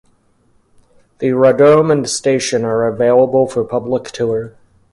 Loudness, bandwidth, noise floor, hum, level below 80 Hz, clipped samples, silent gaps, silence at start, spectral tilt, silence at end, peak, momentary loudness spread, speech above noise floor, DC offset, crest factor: -14 LUFS; 11.5 kHz; -56 dBFS; none; -54 dBFS; under 0.1%; none; 1.2 s; -5 dB/octave; 0.45 s; 0 dBFS; 10 LU; 42 dB; under 0.1%; 14 dB